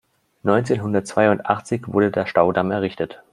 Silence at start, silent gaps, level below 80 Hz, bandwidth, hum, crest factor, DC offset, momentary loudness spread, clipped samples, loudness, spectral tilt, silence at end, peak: 0.45 s; none; -58 dBFS; 11.5 kHz; none; 18 dB; under 0.1%; 6 LU; under 0.1%; -20 LUFS; -6.5 dB/octave; 0.15 s; -2 dBFS